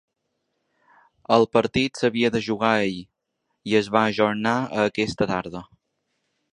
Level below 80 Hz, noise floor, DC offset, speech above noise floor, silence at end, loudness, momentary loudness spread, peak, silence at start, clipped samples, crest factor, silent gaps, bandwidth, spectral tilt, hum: -56 dBFS; -77 dBFS; under 0.1%; 55 dB; 0.9 s; -22 LUFS; 14 LU; -2 dBFS; 1.3 s; under 0.1%; 22 dB; none; 10.5 kHz; -5.5 dB/octave; none